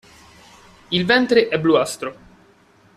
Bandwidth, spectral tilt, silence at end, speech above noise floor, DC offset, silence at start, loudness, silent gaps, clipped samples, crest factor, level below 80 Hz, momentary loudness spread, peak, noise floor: 14 kHz; -4.5 dB/octave; 0.85 s; 36 dB; under 0.1%; 0.9 s; -18 LUFS; none; under 0.1%; 18 dB; -56 dBFS; 13 LU; -2 dBFS; -53 dBFS